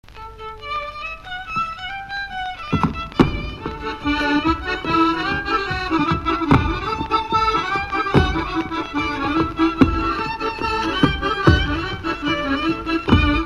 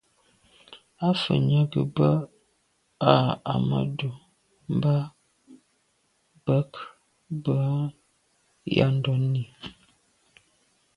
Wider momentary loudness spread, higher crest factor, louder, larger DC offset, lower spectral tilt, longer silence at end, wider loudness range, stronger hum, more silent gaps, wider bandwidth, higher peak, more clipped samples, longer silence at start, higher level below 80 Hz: second, 11 LU vs 17 LU; second, 20 dB vs 26 dB; first, -20 LUFS vs -25 LUFS; neither; second, -6.5 dB/octave vs -8.5 dB/octave; second, 0 s vs 1.25 s; about the same, 4 LU vs 6 LU; neither; neither; first, 12 kHz vs 9.8 kHz; about the same, 0 dBFS vs 0 dBFS; neither; second, 0.05 s vs 0.7 s; first, -32 dBFS vs -58 dBFS